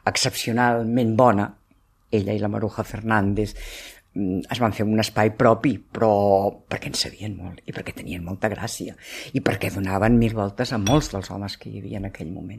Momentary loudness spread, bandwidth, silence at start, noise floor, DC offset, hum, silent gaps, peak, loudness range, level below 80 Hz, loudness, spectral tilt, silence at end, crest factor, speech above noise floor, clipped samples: 15 LU; 14.5 kHz; 0.05 s; -60 dBFS; under 0.1%; none; none; -2 dBFS; 5 LU; -44 dBFS; -23 LUFS; -5.5 dB/octave; 0 s; 20 dB; 38 dB; under 0.1%